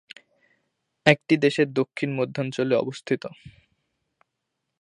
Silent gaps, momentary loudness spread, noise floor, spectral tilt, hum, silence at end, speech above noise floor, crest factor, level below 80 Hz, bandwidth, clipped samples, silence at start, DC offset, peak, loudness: none; 9 LU; -81 dBFS; -6 dB/octave; none; 1.3 s; 57 dB; 26 dB; -66 dBFS; 11 kHz; under 0.1%; 1.05 s; under 0.1%; 0 dBFS; -24 LUFS